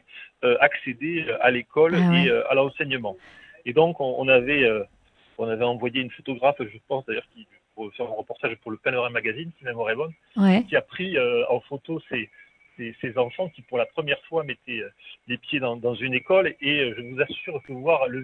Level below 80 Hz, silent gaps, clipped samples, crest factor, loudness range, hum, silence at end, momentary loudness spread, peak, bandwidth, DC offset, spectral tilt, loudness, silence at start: -62 dBFS; none; under 0.1%; 22 dB; 7 LU; none; 0 s; 14 LU; -2 dBFS; 6 kHz; under 0.1%; -7.5 dB/octave; -24 LUFS; 0.15 s